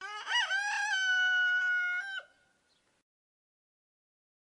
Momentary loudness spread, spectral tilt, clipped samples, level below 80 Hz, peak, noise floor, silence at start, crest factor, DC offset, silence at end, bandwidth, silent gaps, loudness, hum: 9 LU; 4.5 dB/octave; under 0.1%; under -90 dBFS; -20 dBFS; -73 dBFS; 0 s; 14 dB; under 0.1%; 2.3 s; 11.5 kHz; none; -29 LUFS; none